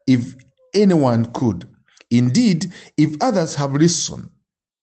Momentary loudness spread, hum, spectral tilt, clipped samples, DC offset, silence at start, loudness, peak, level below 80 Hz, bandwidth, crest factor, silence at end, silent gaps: 11 LU; none; -5.5 dB/octave; under 0.1%; under 0.1%; 0.05 s; -18 LUFS; -4 dBFS; -58 dBFS; 8.8 kHz; 14 dB; 0.55 s; none